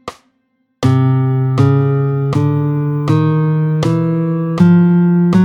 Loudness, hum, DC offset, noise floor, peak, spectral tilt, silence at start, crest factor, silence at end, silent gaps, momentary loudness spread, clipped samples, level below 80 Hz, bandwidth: -13 LUFS; none; under 0.1%; -63 dBFS; 0 dBFS; -9 dB/octave; 0.05 s; 12 dB; 0 s; none; 6 LU; under 0.1%; -50 dBFS; 8.2 kHz